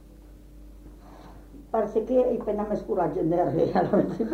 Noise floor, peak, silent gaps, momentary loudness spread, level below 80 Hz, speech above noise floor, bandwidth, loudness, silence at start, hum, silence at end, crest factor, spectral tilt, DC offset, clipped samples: -48 dBFS; -10 dBFS; none; 5 LU; -48 dBFS; 23 dB; 8.6 kHz; -25 LUFS; 0 s; none; 0 s; 18 dB; -9 dB/octave; under 0.1%; under 0.1%